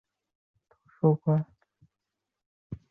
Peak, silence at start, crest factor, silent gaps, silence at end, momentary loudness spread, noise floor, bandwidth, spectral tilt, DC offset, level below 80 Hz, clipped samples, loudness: -12 dBFS; 1.05 s; 20 dB; 2.46-2.70 s; 0.15 s; 21 LU; -86 dBFS; 2.4 kHz; -13.5 dB/octave; under 0.1%; -64 dBFS; under 0.1%; -27 LUFS